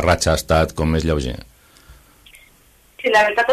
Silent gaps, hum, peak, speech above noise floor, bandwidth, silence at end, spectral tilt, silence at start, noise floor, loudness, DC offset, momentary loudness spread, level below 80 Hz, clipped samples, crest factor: none; none; -2 dBFS; 36 dB; 14 kHz; 0 s; -4.5 dB/octave; 0 s; -53 dBFS; -18 LUFS; under 0.1%; 11 LU; -32 dBFS; under 0.1%; 16 dB